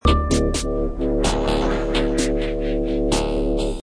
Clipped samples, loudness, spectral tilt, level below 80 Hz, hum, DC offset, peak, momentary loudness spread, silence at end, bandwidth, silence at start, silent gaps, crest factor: under 0.1%; -22 LUFS; -5 dB/octave; -24 dBFS; none; under 0.1%; -2 dBFS; 4 LU; 0.05 s; 11 kHz; 0.05 s; none; 18 dB